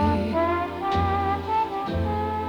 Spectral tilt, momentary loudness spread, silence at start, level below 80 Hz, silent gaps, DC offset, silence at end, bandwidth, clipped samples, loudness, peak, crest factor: -8 dB/octave; 3 LU; 0 s; -38 dBFS; none; under 0.1%; 0 s; 9.8 kHz; under 0.1%; -25 LUFS; -10 dBFS; 14 dB